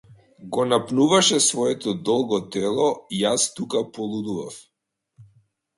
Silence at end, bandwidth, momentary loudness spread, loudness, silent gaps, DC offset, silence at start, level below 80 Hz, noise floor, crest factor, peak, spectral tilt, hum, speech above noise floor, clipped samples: 0.55 s; 11.5 kHz; 13 LU; -22 LUFS; none; under 0.1%; 0.4 s; -64 dBFS; -61 dBFS; 20 dB; -4 dBFS; -3.5 dB/octave; none; 39 dB; under 0.1%